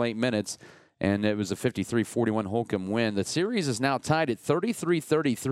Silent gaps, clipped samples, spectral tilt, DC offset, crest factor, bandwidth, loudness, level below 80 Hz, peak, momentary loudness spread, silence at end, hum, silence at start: none; under 0.1%; -5.5 dB/octave; under 0.1%; 18 dB; 15.5 kHz; -27 LUFS; -64 dBFS; -10 dBFS; 4 LU; 0 s; none; 0 s